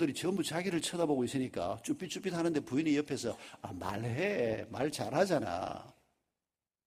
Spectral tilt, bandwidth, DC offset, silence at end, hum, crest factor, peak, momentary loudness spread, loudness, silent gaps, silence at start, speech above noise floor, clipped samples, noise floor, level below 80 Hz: -5 dB/octave; 15.5 kHz; under 0.1%; 0.95 s; none; 20 dB; -14 dBFS; 8 LU; -35 LUFS; none; 0 s; over 56 dB; under 0.1%; under -90 dBFS; -68 dBFS